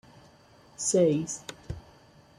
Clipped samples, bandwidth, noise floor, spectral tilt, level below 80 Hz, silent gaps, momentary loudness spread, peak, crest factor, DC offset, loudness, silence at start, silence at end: under 0.1%; 13.5 kHz; -57 dBFS; -5 dB/octave; -54 dBFS; none; 19 LU; -12 dBFS; 18 dB; under 0.1%; -27 LUFS; 0.8 s; 0.6 s